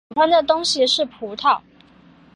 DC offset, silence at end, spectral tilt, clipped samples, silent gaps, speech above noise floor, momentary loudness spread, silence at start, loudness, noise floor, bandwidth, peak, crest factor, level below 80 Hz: under 0.1%; 0.8 s; -1.5 dB/octave; under 0.1%; none; 32 dB; 7 LU; 0.1 s; -18 LUFS; -50 dBFS; 11 kHz; -4 dBFS; 16 dB; -60 dBFS